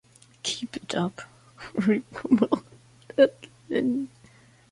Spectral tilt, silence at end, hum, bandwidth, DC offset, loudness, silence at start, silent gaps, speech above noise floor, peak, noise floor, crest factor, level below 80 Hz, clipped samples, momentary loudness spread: -5 dB/octave; 0.65 s; none; 11.5 kHz; under 0.1%; -26 LUFS; 0.45 s; none; 31 dB; -6 dBFS; -55 dBFS; 22 dB; -64 dBFS; under 0.1%; 14 LU